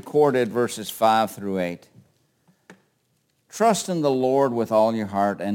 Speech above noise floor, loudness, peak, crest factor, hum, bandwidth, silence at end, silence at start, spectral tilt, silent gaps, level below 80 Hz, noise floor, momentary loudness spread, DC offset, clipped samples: 47 dB; -22 LUFS; -6 dBFS; 18 dB; none; 17 kHz; 0 s; 0.05 s; -5 dB/octave; none; -72 dBFS; -69 dBFS; 8 LU; under 0.1%; under 0.1%